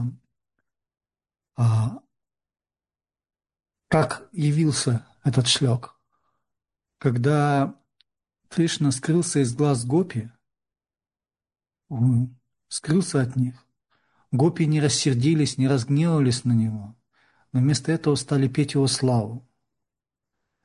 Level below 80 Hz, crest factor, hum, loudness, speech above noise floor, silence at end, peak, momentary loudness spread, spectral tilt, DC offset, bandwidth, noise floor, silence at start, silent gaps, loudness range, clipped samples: -58 dBFS; 20 dB; none; -23 LUFS; over 68 dB; 1.25 s; -4 dBFS; 9 LU; -5.5 dB/octave; under 0.1%; 11 kHz; under -90 dBFS; 0 s; none; 6 LU; under 0.1%